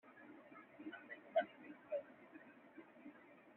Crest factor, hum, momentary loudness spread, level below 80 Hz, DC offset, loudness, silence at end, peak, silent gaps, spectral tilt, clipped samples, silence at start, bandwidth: 24 dB; none; 19 LU; under -90 dBFS; under 0.1%; -47 LUFS; 0 s; -26 dBFS; none; -2.5 dB/octave; under 0.1%; 0.05 s; 4 kHz